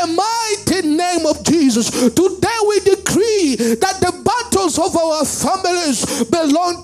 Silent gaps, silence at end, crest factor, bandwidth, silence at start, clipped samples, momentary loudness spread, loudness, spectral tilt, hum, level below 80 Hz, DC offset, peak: none; 0 s; 14 dB; 15.5 kHz; 0 s; under 0.1%; 3 LU; -15 LUFS; -3.5 dB/octave; none; -46 dBFS; under 0.1%; 0 dBFS